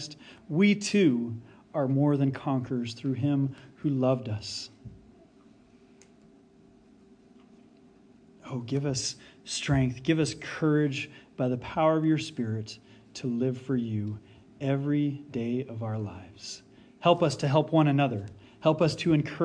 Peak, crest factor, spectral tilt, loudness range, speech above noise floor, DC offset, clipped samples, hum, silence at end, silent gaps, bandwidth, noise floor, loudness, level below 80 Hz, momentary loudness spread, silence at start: -8 dBFS; 20 dB; -6 dB/octave; 9 LU; 30 dB; under 0.1%; under 0.1%; none; 0 s; none; 10 kHz; -57 dBFS; -28 LUFS; -60 dBFS; 16 LU; 0 s